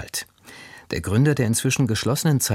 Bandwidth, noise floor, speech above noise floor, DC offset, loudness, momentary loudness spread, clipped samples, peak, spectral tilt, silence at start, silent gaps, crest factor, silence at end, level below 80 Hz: 16.5 kHz; -45 dBFS; 25 dB; under 0.1%; -22 LUFS; 21 LU; under 0.1%; -8 dBFS; -5 dB/octave; 0 s; none; 14 dB; 0 s; -48 dBFS